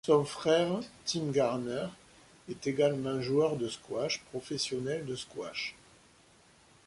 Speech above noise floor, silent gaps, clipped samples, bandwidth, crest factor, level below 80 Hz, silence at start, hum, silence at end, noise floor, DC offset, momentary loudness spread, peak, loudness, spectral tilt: 30 dB; none; under 0.1%; 11.5 kHz; 20 dB; -68 dBFS; 0.05 s; none; 1.15 s; -62 dBFS; under 0.1%; 11 LU; -12 dBFS; -32 LUFS; -5 dB/octave